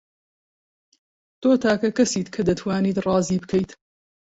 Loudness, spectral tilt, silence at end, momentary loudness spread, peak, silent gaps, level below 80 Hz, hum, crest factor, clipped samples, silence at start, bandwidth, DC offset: -22 LUFS; -5.5 dB/octave; 0.6 s; 6 LU; -6 dBFS; none; -52 dBFS; none; 16 dB; under 0.1%; 1.4 s; 8 kHz; under 0.1%